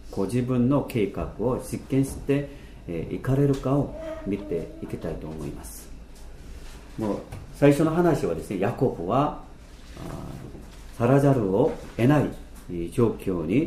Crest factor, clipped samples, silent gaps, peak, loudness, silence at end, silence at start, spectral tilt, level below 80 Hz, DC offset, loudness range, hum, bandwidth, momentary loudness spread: 20 dB; under 0.1%; none; -4 dBFS; -25 LUFS; 0 s; 0 s; -7.5 dB/octave; -42 dBFS; under 0.1%; 7 LU; none; 15.5 kHz; 21 LU